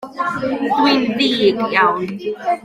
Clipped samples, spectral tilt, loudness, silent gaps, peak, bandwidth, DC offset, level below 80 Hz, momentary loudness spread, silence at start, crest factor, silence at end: under 0.1%; -5 dB/octave; -17 LUFS; none; -2 dBFS; 14.5 kHz; under 0.1%; -56 dBFS; 8 LU; 0 s; 16 dB; 0.05 s